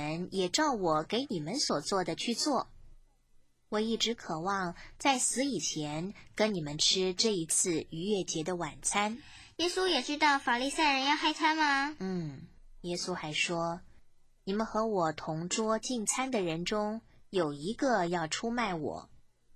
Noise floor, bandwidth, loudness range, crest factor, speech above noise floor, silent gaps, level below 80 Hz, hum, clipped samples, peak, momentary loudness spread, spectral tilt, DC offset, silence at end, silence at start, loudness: -63 dBFS; 16 kHz; 5 LU; 18 dB; 31 dB; none; -60 dBFS; none; under 0.1%; -14 dBFS; 10 LU; -3 dB/octave; under 0.1%; 0.4 s; 0 s; -31 LUFS